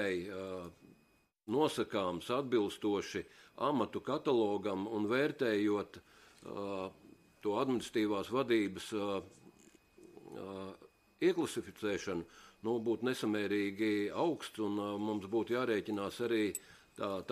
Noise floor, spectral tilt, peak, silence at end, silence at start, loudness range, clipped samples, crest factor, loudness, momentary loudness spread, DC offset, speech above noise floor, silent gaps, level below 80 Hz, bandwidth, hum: -72 dBFS; -5 dB/octave; -18 dBFS; 0 s; 0 s; 4 LU; under 0.1%; 18 dB; -36 LUFS; 14 LU; under 0.1%; 36 dB; none; -74 dBFS; 15.5 kHz; none